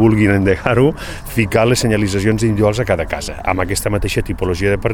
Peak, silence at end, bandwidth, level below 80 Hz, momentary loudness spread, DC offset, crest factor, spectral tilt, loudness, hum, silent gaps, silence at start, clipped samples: 0 dBFS; 0 s; 18 kHz; -30 dBFS; 7 LU; under 0.1%; 16 dB; -6 dB/octave; -16 LUFS; none; none; 0 s; under 0.1%